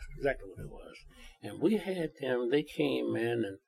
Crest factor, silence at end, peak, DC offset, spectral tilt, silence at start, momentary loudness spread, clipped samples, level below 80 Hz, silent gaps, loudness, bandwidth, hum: 18 dB; 0.1 s; -16 dBFS; under 0.1%; -6.5 dB/octave; 0 s; 17 LU; under 0.1%; -54 dBFS; none; -33 LUFS; 14 kHz; none